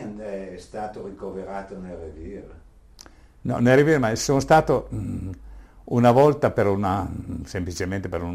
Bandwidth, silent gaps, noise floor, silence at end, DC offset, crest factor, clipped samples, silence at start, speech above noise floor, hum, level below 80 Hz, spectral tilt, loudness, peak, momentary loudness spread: 15.5 kHz; none; -48 dBFS; 0 s; under 0.1%; 18 dB; under 0.1%; 0 s; 26 dB; none; -44 dBFS; -6 dB/octave; -22 LUFS; -6 dBFS; 19 LU